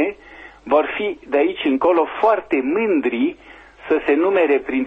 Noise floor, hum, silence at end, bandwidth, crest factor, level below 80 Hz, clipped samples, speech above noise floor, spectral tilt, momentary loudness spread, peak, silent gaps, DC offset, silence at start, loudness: -42 dBFS; none; 0 s; 5.2 kHz; 14 dB; -54 dBFS; under 0.1%; 24 dB; -6.5 dB/octave; 7 LU; -4 dBFS; none; under 0.1%; 0 s; -19 LUFS